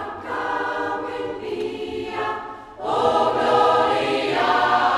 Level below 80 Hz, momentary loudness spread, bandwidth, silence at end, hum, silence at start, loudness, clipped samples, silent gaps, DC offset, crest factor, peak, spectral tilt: -54 dBFS; 11 LU; 12.5 kHz; 0 s; none; 0 s; -22 LUFS; under 0.1%; none; under 0.1%; 16 dB; -4 dBFS; -4.5 dB/octave